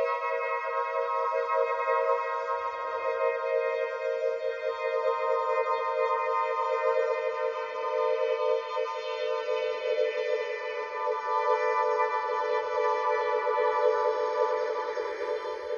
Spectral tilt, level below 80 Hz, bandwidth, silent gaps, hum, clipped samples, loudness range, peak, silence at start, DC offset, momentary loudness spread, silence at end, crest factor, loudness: -1.5 dB/octave; -76 dBFS; 7.2 kHz; none; none; under 0.1%; 2 LU; -12 dBFS; 0 s; under 0.1%; 6 LU; 0 s; 16 dB; -29 LUFS